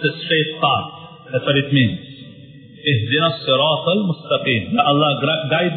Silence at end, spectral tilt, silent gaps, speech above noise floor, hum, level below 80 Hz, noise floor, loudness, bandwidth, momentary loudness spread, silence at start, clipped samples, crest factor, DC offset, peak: 0 s; -11 dB/octave; none; 23 dB; none; -52 dBFS; -41 dBFS; -17 LUFS; 4.5 kHz; 8 LU; 0 s; under 0.1%; 18 dB; under 0.1%; -2 dBFS